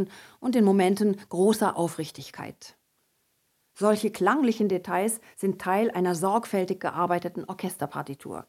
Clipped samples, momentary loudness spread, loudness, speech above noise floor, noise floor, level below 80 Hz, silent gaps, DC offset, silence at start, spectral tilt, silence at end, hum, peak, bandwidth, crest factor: under 0.1%; 13 LU; -26 LUFS; 46 dB; -72 dBFS; -72 dBFS; none; under 0.1%; 0 s; -5.5 dB/octave; 0.05 s; none; -8 dBFS; 16 kHz; 18 dB